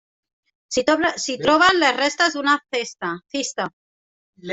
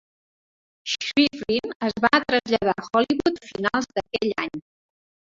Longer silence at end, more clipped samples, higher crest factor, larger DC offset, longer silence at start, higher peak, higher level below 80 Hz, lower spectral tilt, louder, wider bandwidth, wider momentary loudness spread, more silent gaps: second, 0 s vs 0.7 s; neither; about the same, 18 dB vs 22 dB; neither; second, 0.7 s vs 0.85 s; about the same, -4 dBFS vs -2 dBFS; about the same, -58 dBFS vs -56 dBFS; second, -2 dB/octave vs -4 dB/octave; first, -20 LUFS vs -23 LUFS; about the same, 8.4 kHz vs 7.8 kHz; first, 13 LU vs 9 LU; first, 3.73-4.33 s vs 1.75-1.80 s